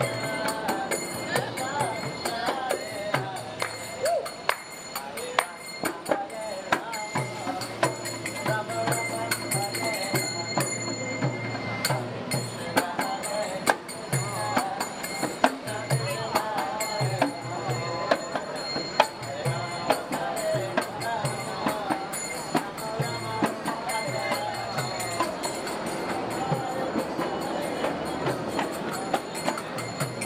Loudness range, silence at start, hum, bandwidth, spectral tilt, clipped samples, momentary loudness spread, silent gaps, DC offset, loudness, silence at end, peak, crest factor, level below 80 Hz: 2 LU; 0 s; none; 16.5 kHz; -4 dB/octave; under 0.1%; 5 LU; none; under 0.1%; -29 LUFS; 0 s; -2 dBFS; 28 dB; -62 dBFS